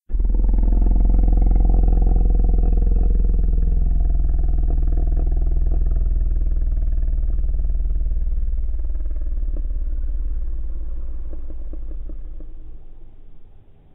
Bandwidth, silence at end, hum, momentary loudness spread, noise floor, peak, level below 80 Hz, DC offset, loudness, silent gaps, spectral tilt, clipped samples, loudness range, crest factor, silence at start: 1.4 kHz; 0.45 s; none; 15 LU; -44 dBFS; -6 dBFS; -18 dBFS; under 0.1%; -23 LUFS; none; -13.5 dB/octave; under 0.1%; 12 LU; 12 dB; 0.1 s